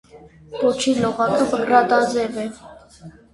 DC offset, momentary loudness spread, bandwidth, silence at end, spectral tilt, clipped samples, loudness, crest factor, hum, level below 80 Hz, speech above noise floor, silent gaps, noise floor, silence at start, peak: under 0.1%; 13 LU; 11.5 kHz; 0.25 s; -4.5 dB/octave; under 0.1%; -19 LUFS; 20 dB; none; -54 dBFS; 25 dB; none; -43 dBFS; 0.15 s; -2 dBFS